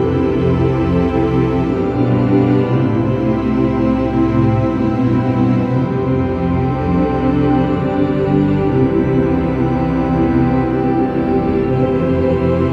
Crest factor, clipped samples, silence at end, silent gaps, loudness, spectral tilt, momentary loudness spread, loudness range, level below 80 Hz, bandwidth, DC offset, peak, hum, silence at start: 14 dB; under 0.1%; 0 s; none; -15 LUFS; -10 dB/octave; 2 LU; 1 LU; -30 dBFS; 6.2 kHz; under 0.1%; 0 dBFS; none; 0 s